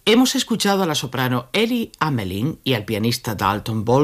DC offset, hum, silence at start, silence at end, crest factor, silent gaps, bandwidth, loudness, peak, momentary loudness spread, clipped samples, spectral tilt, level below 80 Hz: under 0.1%; none; 0.05 s; 0 s; 16 dB; none; 15.5 kHz; -20 LUFS; -4 dBFS; 5 LU; under 0.1%; -4.5 dB/octave; -50 dBFS